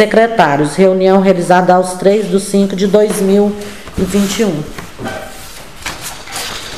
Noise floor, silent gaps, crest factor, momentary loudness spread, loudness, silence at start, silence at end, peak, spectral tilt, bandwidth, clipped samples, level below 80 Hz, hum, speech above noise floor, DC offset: -31 dBFS; none; 12 dB; 16 LU; -12 LUFS; 0 s; 0 s; 0 dBFS; -5.5 dB/octave; 15.5 kHz; 0.2%; -38 dBFS; none; 20 dB; 2%